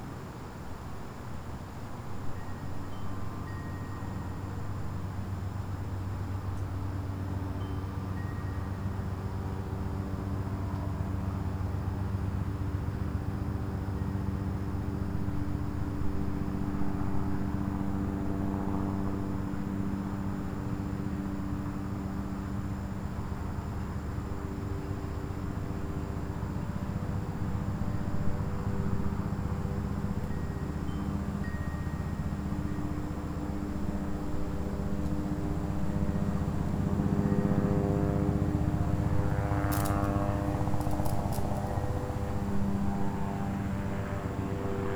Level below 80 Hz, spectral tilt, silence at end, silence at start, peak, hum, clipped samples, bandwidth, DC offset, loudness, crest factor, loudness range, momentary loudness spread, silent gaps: -40 dBFS; -8 dB/octave; 0 s; 0 s; -14 dBFS; none; under 0.1%; over 20 kHz; under 0.1%; -34 LUFS; 18 dB; 7 LU; 8 LU; none